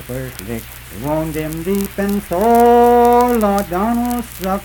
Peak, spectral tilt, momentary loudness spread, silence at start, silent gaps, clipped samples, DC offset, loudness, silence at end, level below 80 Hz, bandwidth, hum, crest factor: -2 dBFS; -6 dB/octave; 17 LU; 0 s; none; under 0.1%; under 0.1%; -15 LUFS; 0 s; -36 dBFS; 19.5 kHz; none; 14 dB